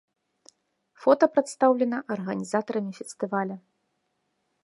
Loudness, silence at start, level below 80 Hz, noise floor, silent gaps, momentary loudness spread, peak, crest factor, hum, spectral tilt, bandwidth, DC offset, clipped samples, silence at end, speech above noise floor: -26 LUFS; 1 s; -80 dBFS; -76 dBFS; none; 13 LU; -6 dBFS; 22 dB; none; -6 dB/octave; 11.5 kHz; under 0.1%; under 0.1%; 1.05 s; 51 dB